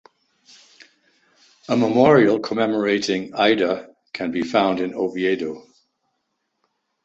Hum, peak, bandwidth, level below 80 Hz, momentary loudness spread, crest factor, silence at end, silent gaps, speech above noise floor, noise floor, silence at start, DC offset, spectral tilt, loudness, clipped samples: none; -2 dBFS; 8 kHz; -62 dBFS; 14 LU; 20 dB; 1.45 s; none; 55 dB; -74 dBFS; 1.7 s; under 0.1%; -5.5 dB/octave; -20 LUFS; under 0.1%